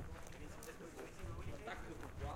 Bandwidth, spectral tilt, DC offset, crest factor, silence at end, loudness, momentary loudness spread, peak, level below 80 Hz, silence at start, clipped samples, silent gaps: 16.5 kHz; -5 dB/octave; under 0.1%; 16 dB; 0 s; -51 LUFS; 4 LU; -34 dBFS; -54 dBFS; 0 s; under 0.1%; none